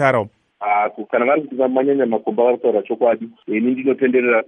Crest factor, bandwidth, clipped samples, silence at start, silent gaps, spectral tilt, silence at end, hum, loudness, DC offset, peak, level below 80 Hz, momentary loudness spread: 16 dB; 9.2 kHz; under 0.1%; 0 s; none; -8 dB/octave; 0.05 s; none; -18 LUFS; under 0.1%; -2 dBFS; -68 dBFS; 5 LU